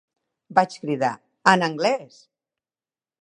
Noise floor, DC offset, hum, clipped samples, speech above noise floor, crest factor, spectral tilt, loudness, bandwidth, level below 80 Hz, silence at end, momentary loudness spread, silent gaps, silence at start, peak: under -90 dBFS; under 0.1%; none; under 0.1%; over 68 dB; 24 dB; -4.5 dB/octave; -22 LUFS; 11 kHz; -76 dBFS; 1.2 s; 8 LU; none; 0.5 s; 0 dBFS